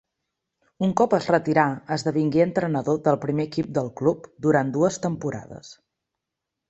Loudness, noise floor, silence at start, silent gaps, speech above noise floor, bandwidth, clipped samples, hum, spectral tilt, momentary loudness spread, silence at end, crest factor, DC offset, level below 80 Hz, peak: -23 LUFS; -84 dBFS; 0.8 s; none; 62 dB; 8.2 kHz; under 0.1%; none; -6.5 dB/octave; 7 LU; 0.95 s; 20 dB; under 0.1%; -60 dBFS; -4 dBFS